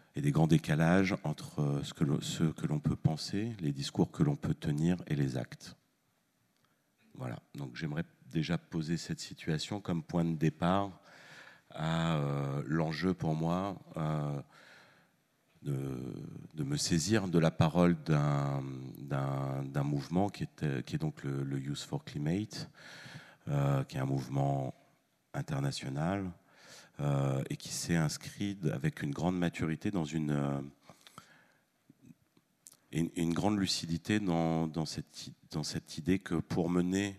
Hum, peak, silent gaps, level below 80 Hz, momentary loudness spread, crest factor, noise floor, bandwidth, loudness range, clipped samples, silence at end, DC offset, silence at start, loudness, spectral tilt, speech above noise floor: none; -12 dBFS; none; -60 dBFS; 14 LU; 22 dB; -76 dBFS; 13.5 kHz; 7 LU; under 0.1%; 0 s; under 0.1%; 0.15 s; -34 LUFS; -6 dB/octave; 42 dB